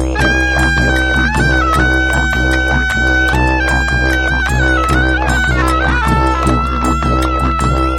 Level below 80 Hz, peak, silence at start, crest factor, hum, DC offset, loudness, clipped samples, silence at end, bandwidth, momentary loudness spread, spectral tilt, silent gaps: -18 dBFS; 0 dBFS; 0 s; 12 dB; none; under 0.1%; -13 LUFS; under 0.1%; 0 s; 12.5 kHz; 2 LU; -5 dB/octave; none